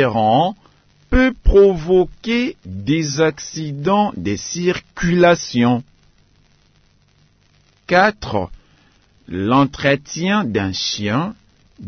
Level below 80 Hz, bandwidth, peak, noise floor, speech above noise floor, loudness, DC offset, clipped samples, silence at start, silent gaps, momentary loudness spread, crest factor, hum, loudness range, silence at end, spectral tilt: -30 dBFS; 6.6 kHz; -2 dBFS; -56 dBFS; 39 dB; -17 LUFS; under 0.1%; under 0.1%; 0 s; none; 11 LU; 16 dB; none; 5 LU; 0 s; -5.5 dB/octave